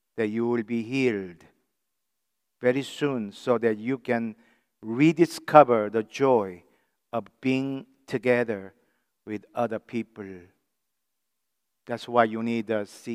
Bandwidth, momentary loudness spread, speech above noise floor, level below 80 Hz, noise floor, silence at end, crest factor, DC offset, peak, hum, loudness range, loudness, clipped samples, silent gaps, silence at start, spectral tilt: 15.5 kHz; 15 LU; 58 dB; -78 dBFS; -83 dBFS; 0 s; 26 dB; under 0.1%; 0 dBFS; none; 8 LU; -26 LUFS; under 0.1%; none; 0.15 s; -6.5 dB/octave